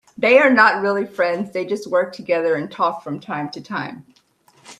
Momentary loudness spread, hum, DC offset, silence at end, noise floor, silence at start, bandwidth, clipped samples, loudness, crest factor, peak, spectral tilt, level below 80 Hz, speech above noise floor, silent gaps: 15 LU; none; under 0.1%; 0.05 s; -56 dBFS; 0.2 s; 11.5 kHz; under 0.1%; -18 LUFS; 20 dB; 0 dBFS; -5.5 dB/octave; -68 dBFS; 38 dB; none